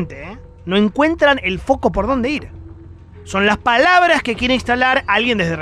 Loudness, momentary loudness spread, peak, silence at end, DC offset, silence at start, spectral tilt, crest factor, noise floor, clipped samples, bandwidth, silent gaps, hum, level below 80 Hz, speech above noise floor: -15 LUFS; 14 LU; -2 dBFS; 0 s; under 0.1%; 0 s; -5 dB/octave; 14 dB; -38 dBFS; under 0.1%; 12 kHz; none; none; -36 dBFS; 22 dB